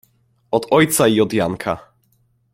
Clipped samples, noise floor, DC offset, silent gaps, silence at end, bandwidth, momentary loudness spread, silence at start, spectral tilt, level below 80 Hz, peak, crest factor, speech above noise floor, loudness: under 0.1%; -61 dBFS; under 0.1%; none; 0.75 s; 16.5 kHz; 11 LU; 0.5 s; -4.5 dB/octave; -54 dBFS; -2 dBFS; 18 dB; 45 dB; -17 LUFS